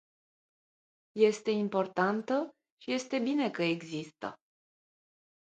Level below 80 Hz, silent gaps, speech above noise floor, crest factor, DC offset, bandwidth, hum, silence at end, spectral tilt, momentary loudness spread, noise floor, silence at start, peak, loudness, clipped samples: -80 dBFS; 2.70-2.77 s; over 59 dB; 20 dB; under 0.1%; 9 kHz; none; 1.15 s; -5.5 dB/octave; 15 LU; under -90 dBFS; 1.15 s; -12 dBFS; -31 LUFS; under 0.1%